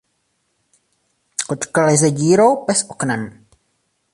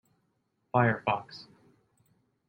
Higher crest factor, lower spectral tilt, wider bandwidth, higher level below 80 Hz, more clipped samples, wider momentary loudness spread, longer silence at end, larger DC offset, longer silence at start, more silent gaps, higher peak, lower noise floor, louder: second, 18 dB vs 24 dB; second, -4.5 dB/octave vs -8 dB/octave; first, 11.5 kHz vs 6.2 kHz; first, -60 dBFS vs -68 dBFS; neither; second, 13 LU vs 21 LU; second, 0.85 s vs 1.05 s; neither; first, 1.4 s vs 0.75 s; neither; first, -2 dBFS vs -10 dBFS; second, -68 dBFS vs -76 dBFS; first, -17 LUFS vs -29 LUFS